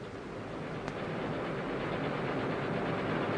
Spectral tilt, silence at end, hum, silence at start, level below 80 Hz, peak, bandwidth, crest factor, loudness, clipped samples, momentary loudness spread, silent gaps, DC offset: -7 dB/octave; 0 s; none; 0 s; -56 dBFS; -18 dBFS; 10.5 kHz; 18 dB; -36 LUFS; under 0.1%; 7 LU; none; under 0.1%